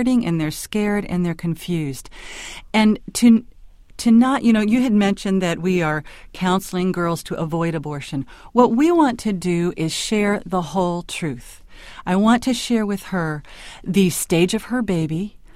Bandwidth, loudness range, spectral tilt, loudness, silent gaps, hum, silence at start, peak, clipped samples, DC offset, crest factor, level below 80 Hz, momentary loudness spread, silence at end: 15.5 kHz; 4 LU; -5.5 dB/octave; -20 LUFS; none; none; 0 s; 0 dBFS; under 0.1%; under 0.1%; 18 dB; -44 dBFS; 13 LU; 0.2 s